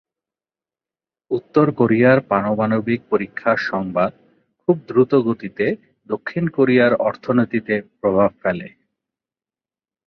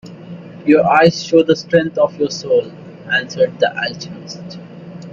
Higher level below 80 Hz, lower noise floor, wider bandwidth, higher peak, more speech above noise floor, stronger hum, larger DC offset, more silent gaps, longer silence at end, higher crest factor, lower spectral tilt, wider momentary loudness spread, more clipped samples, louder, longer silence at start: about the same, -56 dBFS vs -56 dBFS; first, under -90 dBFS vs -33 dBFS; second, 6.2 kHz vs 7.4 kHz; about the same, -2 dBFS vs 0 dBFS; first, over 72 dB vs 18 dB; neither; neither; neither; first, 1.4 s vs 0 s; about the same, 18 dB vs 16 dB; first, -9 dB/octave vs -5.5 dB/octave; second, 11 LU vs 22 LU; neither; second, -19 LUFS vs -15 LUFS; first, 1.3 s vs 0.05 s